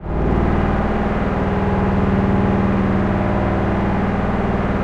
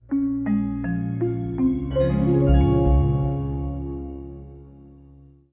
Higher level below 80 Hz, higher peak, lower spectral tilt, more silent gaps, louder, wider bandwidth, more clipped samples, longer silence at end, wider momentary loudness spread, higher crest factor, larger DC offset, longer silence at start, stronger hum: about the same, -26 dBFS vs -28 dBFS; about the same, -6 dBFS vs -6 dBFS; second, -9 dB/octave vs -13 dB/octave; neither; first, -18 LUFS vs -22 LUFS; first, 7 kHz vs 4 kHz; neither; second, 0 s vs 0.6 s; second, 3 LU vs 17 LU; about the same, 12 dB vs 16 dB; neither; about the same, 0 s vs 0.1 s; neither